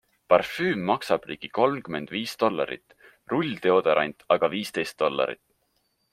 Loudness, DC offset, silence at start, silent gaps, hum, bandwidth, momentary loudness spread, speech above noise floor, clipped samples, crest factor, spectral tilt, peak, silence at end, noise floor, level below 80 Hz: -25 LUFS; under 0.1%; 0.3 s; none; none; 16 kHz; 10 LU; 47 dB; under 0.1%; 24 dB; -5.5 dB/octave; -2 dBFS; 0.8 s; -72 dBFS; -66 dBFS